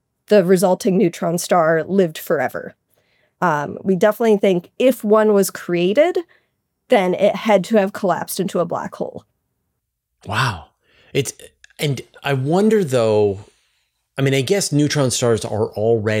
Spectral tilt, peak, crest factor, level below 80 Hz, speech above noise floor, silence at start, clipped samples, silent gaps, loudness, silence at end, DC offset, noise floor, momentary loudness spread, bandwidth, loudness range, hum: -5.5 dB/octave; -2 dBFS; 16 dB; -62 dBFS; 58 dB; 0.3 s; under 0.1%; none; -18 LUFS; 0 s; under 0.1%; -75 dBFS; 9 LU; 17 kHz; 8 LU; none